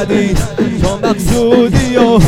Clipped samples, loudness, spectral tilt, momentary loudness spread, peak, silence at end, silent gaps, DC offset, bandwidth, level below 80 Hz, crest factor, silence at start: 0.3%; -12 LUFS; -6 dB/octave; 5 LU; 0 dBFS; 0 s; none; under 0.1%; 16.5 kHz; -22 dBFS; 10 dB; 0 s